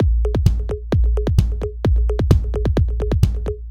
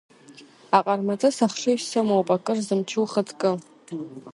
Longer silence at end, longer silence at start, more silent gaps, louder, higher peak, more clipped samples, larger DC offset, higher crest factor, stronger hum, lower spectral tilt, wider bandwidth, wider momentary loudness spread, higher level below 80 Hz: about the same, 0 s vs 0 s; second, 0 s vs 0.3 s; neither; first, -20 LUFS vs -23 LUFS; about the same, 0 dBFS vs -2 dBFS; neither; neither; second, 16 dB vs 22 dB; neither; first, -8.5 dB/octave vs -5 dB/octave; about the same, 12.5 kHz vs 11.5 kHz; second, 4 LU vs 13 LU; first, -20 dBFS vs -74 dBFS